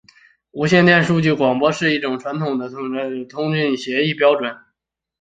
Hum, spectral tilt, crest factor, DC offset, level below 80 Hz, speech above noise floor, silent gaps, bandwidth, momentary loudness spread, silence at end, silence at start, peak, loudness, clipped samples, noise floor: none; -6 dB/octave; 18 dB; under 0.1%; -58 dBFS; 60 dB; none; 9 kHz; 12 LU; 0.65 s; 0.55 s; 0 dBFS; -18 LUFS; under 0.1%; -78 dBFS